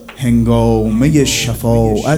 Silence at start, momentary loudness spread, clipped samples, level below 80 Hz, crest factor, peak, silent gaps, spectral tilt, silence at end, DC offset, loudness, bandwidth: 0 s; 3 LU; under 0.1%; -26 dBFS; 12 dB; 0 dBFS; none; -5.5 dB/octave; 0 s; under 0.1%; -13 LUFS; over 20 kHz